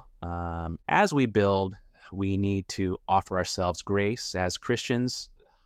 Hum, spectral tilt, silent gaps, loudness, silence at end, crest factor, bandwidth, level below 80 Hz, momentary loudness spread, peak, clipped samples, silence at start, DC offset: none; -5.5 dB/octave; none; -28 LUFS; 0.4 s; 20 dB; 14.5 kHz; -50 dBFS; 11 LU; -8 dBFS; under 0.1%; 0.2 s; under 0.1%